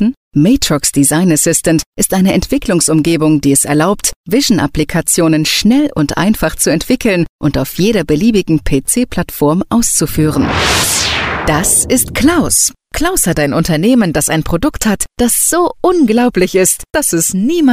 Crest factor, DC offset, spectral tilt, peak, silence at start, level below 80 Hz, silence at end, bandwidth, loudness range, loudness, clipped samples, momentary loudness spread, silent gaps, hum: 12 dB; under 0.1%; -4 dB/octave; 0 dBFS; 0 s; -30 dBFS; 0 s; 16 kHz; 2 LU; -11 LUFS; under 0.1%; 4 LU; 0.17-0.31 s, 1.86-1.93 s, 4.16-4.24 s, 7.29-7.39 s; none